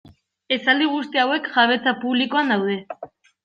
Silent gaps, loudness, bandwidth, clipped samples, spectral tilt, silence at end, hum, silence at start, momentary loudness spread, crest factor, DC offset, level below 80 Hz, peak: none; -20 LUFS; 7 kHz; under 0.1%; -5.5 dB/octave; 0.4 s; none; 0.5 s; 9 LU; 18 dB; under 0.1%; -70 dBFS; -4 dBFS